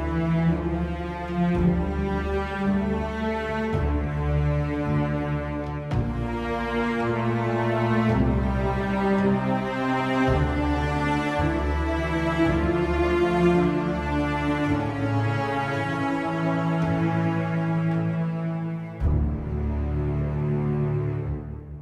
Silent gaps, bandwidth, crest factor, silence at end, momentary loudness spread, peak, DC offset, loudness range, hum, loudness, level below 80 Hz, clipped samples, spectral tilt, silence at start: none; 10.5 kHz; 16 dB; 0 s; 6 LU; -8 dBFS; under 0.1%; 3 LU; none; -25 LUFS; -34 dBFS; under 0.1%; -8 dB/octave; 0 s